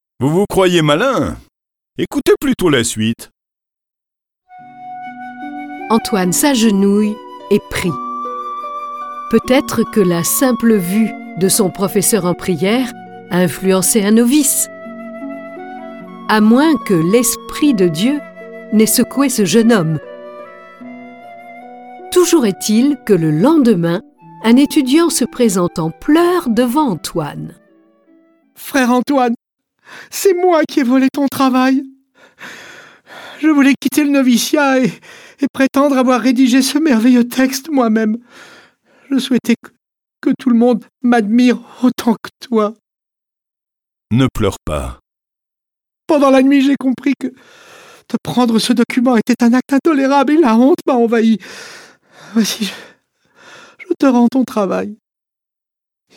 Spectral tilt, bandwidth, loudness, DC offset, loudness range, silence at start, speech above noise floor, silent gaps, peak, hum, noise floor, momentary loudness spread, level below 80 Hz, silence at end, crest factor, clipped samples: -4.5 dB/octave; 19 kHz; -14 LUFS; under 0.1%; 5 LU; 0.2 s; 72 dB; 35.50-35.54 s; 0 dBFS; none; -85 dBFS; 19 LU; -44 dBFS; 1.2 s; 14 dB; under 0.1%